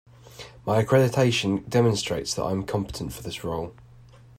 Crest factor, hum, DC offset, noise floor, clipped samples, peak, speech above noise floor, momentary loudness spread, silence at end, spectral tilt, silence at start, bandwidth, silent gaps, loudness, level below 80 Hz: 18 dB; none; under 0.1%; -50 dBFS; under 0.1%; -8 dBFS; 26 dB; 14 LU; 0.55 s; -5.5 dB/octave; 0.3 s; 16 kHz; none; -25 LUFS; -50 dBFS